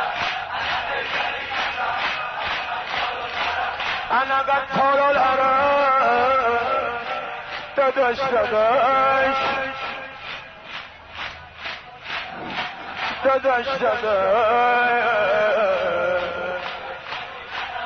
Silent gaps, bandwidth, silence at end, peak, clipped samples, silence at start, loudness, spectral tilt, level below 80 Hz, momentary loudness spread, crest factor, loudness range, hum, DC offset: none; 6.6 kHz; 0 s; -8 dBFS; under 0.1%; 0 s; -21 LUFS; -4 dB/octave; -54 dBFS; 15 LU; 12 dB; 7 LU; none; under 0.1%